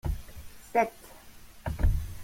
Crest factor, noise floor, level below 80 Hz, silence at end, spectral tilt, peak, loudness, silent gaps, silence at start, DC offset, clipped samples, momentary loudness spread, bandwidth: 20 dB; -49 dBFS; -34 dBFS; 0 s; -6.5 dB/octave; -10 dBFS; -32 LUFS; none; 0.05 s; under 0.1%; under 0.1%; 22 LU; 16.5 kHz